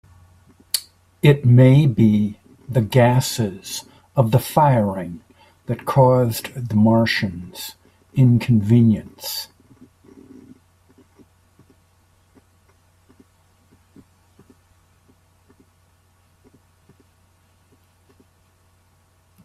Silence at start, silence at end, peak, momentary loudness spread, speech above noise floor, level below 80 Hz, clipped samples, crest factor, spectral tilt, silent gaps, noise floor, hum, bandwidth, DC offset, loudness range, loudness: 0.75 s; 10 s; -2 dBFS; 18 LU; 42 dB; -54 dBFS; under 0.1%; 20 dB; -6.5 dB/octave; none; -59 dBFS; none; 15.5 kHz; under 0.1%; 6 LU; -18 LUFS